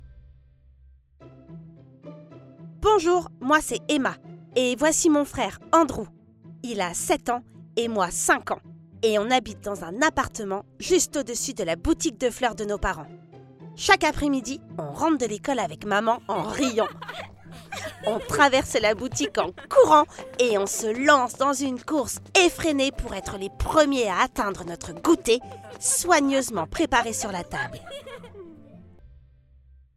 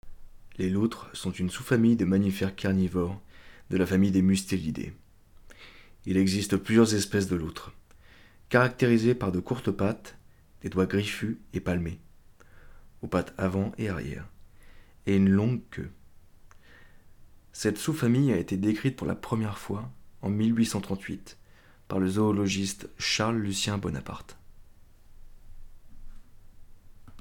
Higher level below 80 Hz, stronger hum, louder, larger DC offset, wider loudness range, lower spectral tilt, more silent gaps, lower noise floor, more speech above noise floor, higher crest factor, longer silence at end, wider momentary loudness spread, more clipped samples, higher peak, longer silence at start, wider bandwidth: first, -46 dBFS vs -52 dBFS; neither; first, -24 LUFS vs -28 LUFS; neither; about the same, 5 LU vs 6 LU; second, -3 dB/octave vs -6 dB/octave; neither; about the same, -55 dBFS vs -54 dBFS; first, 31 dB vs 27 dB; about the same, 24 dB vs 22 dB; first, 0.9 s vs 0 s; about the same, 15 LU vs 16 LU; neither; first, -2 dBFS vs -8 dBFS; about the same, 0 s vs 0.05 s; second, 16 kHz vs 18 kHz